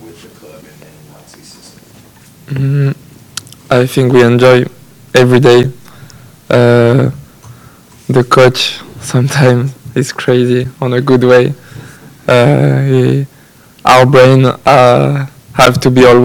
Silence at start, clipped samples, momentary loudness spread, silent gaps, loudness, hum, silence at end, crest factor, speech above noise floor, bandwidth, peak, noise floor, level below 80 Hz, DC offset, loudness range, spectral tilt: 0.05 s; 2%; 15 LU; none; -9 LUFS; none; 0 s; 10 dB; 32 dB; 18 kHz; 0 dBFS; -41 dBFS; -42 dBFS; under 0.1%; 5 LU; -6.5 dB/octave